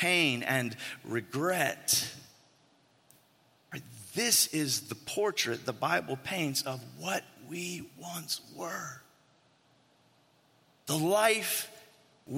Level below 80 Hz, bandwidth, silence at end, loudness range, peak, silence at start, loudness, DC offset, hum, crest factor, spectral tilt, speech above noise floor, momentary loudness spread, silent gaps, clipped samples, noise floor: -76 dBFS; 16.5 kHz; 0 s; 9 LU; -12 dBFS; 0 s; -31 LUFS; under 0.1%; none; 22 dB; -2.5 dB/octave; 35 dB; 17 LU; none; under 0.1%; -67 dBFS